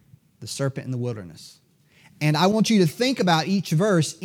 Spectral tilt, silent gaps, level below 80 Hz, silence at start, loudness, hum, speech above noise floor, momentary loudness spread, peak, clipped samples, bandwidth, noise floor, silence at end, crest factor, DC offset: -5.5 dB/octave; none; -70 dBFS; 0.4 s; -22 LUFS; none; 34 dB; 15 LU; -8 dBFS; under 0.1%; 16.5 kHz; -56 dBFS; 0 s; 16 dB; under 0.1%